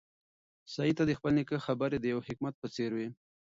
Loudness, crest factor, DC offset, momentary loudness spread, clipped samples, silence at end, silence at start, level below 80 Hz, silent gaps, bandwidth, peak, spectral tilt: -33 LUFS; 18 dB; under 0.1%; 9 LU; under 0.1%; 0.45 s; 0.65 s; -64 dBFS; 2.54-2.62 s; 7.6 kHz; -16 dBFS; -7 dB/octave